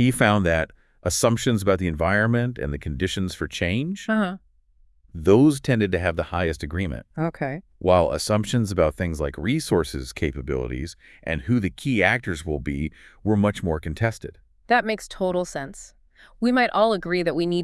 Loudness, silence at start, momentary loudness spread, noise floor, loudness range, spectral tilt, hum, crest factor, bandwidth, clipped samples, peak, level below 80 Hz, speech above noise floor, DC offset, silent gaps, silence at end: -23 LUFS; 0 s; 11 LU; -58 dBFS; 3 LU; -5.5 dB/octave; none; 22 dB; 12 kHz; under 0.1%; 0 dBFS; -42 dBFS; 35 dB; under 0.1%; none; 0 s